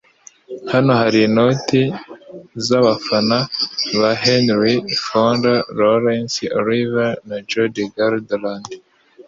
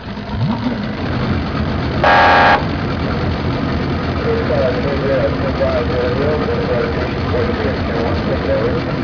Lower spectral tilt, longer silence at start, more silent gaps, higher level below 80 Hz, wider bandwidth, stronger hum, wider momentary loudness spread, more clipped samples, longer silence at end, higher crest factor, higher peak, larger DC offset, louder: second, -5.5 dB/octave vs -7.5 dB/octave; first, 0.5 s vs 0 s; neither; second, -56 dBFS vs -28 dBFS; first, 7.8 kHz vs 5.4 kHz; neither; first, 15 LU vs 8 LU; neither; about the same, 0.05 s vs 0 s; about the same, 16 dB vs 12 dB; about the same, -2 dBFS vs -4 dBFS; second, under 0.1% vs 0.4%; about the same, -17 LUFS vs -16 LUFS